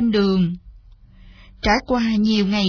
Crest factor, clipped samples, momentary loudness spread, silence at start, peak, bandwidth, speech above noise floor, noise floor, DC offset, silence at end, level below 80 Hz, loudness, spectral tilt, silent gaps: 16 dB; under 0.1%; 7 LU; 0 s; -4 dBFS; 5.4 kHz; 28 dB; -46 dBFS; under 0.1%; 0 s; -38 dBFS; -19 LUFS; -6 dB/octave; none